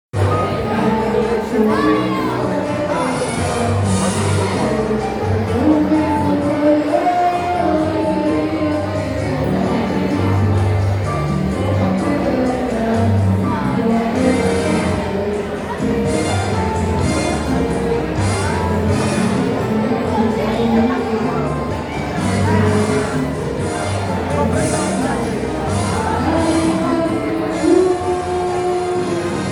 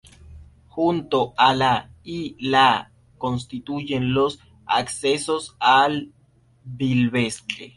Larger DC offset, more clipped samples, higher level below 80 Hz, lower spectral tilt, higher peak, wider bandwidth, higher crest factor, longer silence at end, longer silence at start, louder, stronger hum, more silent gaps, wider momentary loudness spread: neither; neither; first, -36 dBFS vs -52 dBFS; first, -6.5 dB/octave vs -4.5 dB/octave; about the same, -2 dBFS vs -4 dBFS; first, 15 kHz vs 11.5 kHz; about the same, 16 dB vs 20 dB; about the same, 0 s vs 0.1 s; second, 0.15 s vs 0.3 s; first, -17 LUFS vs -21 LUFS; neither; neither; second, 5 LU vs 14 LU